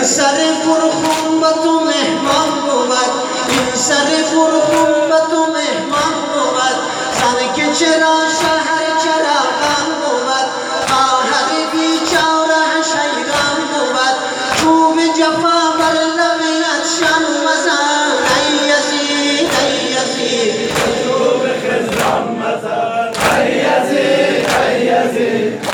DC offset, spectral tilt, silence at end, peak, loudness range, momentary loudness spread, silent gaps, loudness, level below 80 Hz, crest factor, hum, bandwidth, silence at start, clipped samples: under 0.1%; -2.5 dB/octave; 0 s; 0 dBFS; 2 LU; 4 LU; none; -13 LUFS; -50 dBFS; 14 dB; none; 19.5 kHz; 0 s; under 0.1%